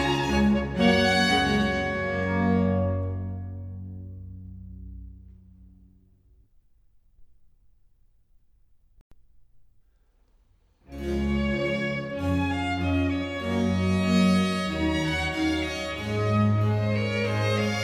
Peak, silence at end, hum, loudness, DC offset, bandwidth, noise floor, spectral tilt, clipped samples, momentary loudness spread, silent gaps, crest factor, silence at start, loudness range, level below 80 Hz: -8 dBFS; 0 s; none; -25 LUFS; under 0.1%; 13.5 kHz; -63 dBFS; -6 dB/octave; under 0.1%; 19 LU; 9.01-9.11 s; 20 dB; 0 s; 18 LU; -42 dBFS